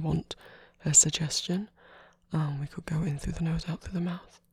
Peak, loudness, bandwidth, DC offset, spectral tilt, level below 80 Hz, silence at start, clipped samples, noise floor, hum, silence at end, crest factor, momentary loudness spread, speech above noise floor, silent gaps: -8 dBFS; -28 LUFS; 14.5 kHz; under 0.1%; -3.5 dB/octave; -48 dBFS; 0 s; under 0.1%; -56 dBFS; none; 0.3 s; 22 dB; 18 LU; 27 dB; none